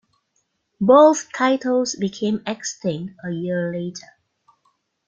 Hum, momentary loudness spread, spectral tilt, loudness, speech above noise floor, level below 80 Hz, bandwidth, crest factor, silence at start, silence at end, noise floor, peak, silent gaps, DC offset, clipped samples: none; 17 LU; -5 dB/octave; -20 LUFS; 51 dB; -66 dBFS; 9 kHz; 20 dB; 0.8 s; 1.1 s; -71 dBFS; -2 dBFS; none; under 0.1%; under 0.1%